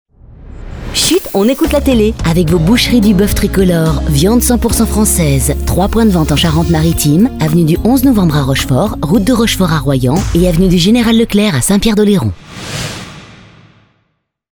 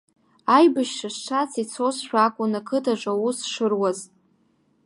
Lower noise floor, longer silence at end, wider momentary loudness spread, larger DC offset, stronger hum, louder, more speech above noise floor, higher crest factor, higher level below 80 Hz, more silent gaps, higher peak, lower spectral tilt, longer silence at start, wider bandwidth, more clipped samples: about the same, -64 dBFS vs -64 dBFS; first, 1.3 s vs 0.8 s; second, 5 LU vs 10 LU; neither; neither; first, -11 LUFS vs -23 LUFS; first, 54 dB vs 42 dB; second, 10 dB vs 20 dB; first, -22 dBFS vs -80 dBFS; neither; first, 0 dBFS vs -4 dBFS; about the same, -5 dB/octave vs -4 dB/octave; second, 0.3 s vs 0.45 s; first, over 20 kHz vs 11.5 kHz; neither